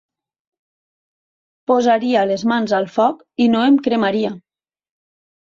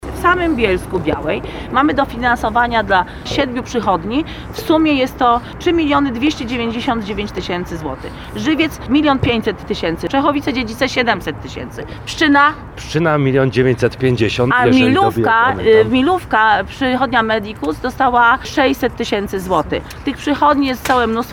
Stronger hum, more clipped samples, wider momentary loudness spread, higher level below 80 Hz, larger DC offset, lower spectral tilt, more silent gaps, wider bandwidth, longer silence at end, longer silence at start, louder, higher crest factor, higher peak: neither; neither; second, 7 LU vs 10 LU; second, -64 dBFS vs -36 dBFS; neither; about the same, -5.5 dB/octave vs -5.5 dB/octave; neither; second, 7.4 kHz vs 17.5 kHz; first, 1.05 s vs 0 s; first, 1.7 s vs 0 s; about the same, -17 LUFS vs -15 LUFS; about the same, 16 dB vs 16 dB; about the same, -2 dBFS vs 0 dBFS